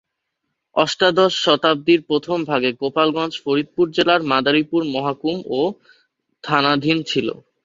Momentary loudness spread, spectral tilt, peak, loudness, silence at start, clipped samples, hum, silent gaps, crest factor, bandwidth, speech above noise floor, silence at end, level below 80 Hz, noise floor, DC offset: 7 LU; -5 dB/octave; -2 dBFS; -18 LUFS; 0.75 s; under 0.1%; none; none; 18 dB; 7.8 kHz; 58 dB; 0.3 s; -62 dBFS; -77 dBFS; under 0.1%